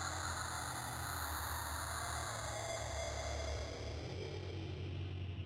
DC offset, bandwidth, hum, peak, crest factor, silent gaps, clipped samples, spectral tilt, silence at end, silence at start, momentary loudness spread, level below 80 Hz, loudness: under 0.1%; 16 kHz; none; -28 dBFS; 16 dB; none; under 0.1%; -3.5 dB/octave; 0 s; 0 s; 4 LU; -50 dBFS; -42 LUFS